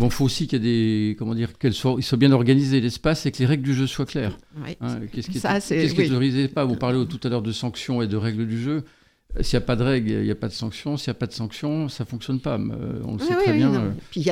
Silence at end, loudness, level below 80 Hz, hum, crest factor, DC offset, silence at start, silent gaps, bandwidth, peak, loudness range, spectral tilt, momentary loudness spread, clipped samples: 0 s; -23 LUFS; -42 dBFS; none; 18 dB; under 0.1%; 0 s; none; 15 kHz; -4 dBFS; 5 LU; -6.5 dB/octave; 11 LU; under 0.1%